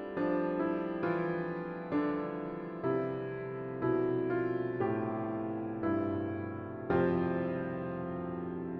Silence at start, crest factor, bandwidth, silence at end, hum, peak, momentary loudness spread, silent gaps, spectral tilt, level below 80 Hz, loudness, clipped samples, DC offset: 0 s; 18 dB; 5 kHz; 0 s; none; -16 dBFS; 8 LU; none; -10.5 dB/octave; -66 dBFS; -35 LUFS; under 0.1%; under 0.1%